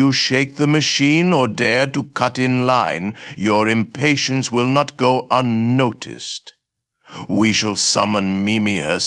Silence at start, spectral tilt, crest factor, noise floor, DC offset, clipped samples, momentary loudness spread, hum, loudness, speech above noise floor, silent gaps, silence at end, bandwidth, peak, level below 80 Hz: 0 s; -4.5 dB/octave; 16 dB; -67 dBFS; under 0.1%; under 0.1%; 8 LU; none; -17 LUFS; 50 dB; none; 0 s; 11.5 kHz; -2 dBFS; -58 dBFS